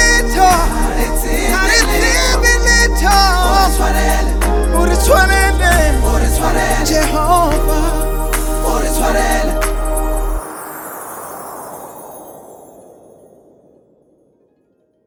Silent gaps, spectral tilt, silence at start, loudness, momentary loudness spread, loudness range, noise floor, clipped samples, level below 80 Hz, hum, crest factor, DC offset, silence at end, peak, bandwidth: none; -3.5 dB/octave; 0 s; -13 LUFS; 17 LU; 16 LU; -59 dBFS; under 0.1%; -16 dBFS; none; 14 dB; under 0.1%; 2.5 s; 0 dBFS; 19 kHz